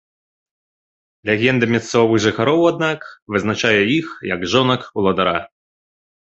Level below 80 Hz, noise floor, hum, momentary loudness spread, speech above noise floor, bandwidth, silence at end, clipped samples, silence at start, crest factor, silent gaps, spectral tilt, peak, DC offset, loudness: -52 dBFS; under -90 dBFS; none; 8 LU; over 73 dB; 8.2 kHz; 0.9 s; under 0.1%; 1.25 s; 18 dB; 3.22-3.26 s; -5 dB/octave; 0 dBFS; under 0.1%; -17 LUFS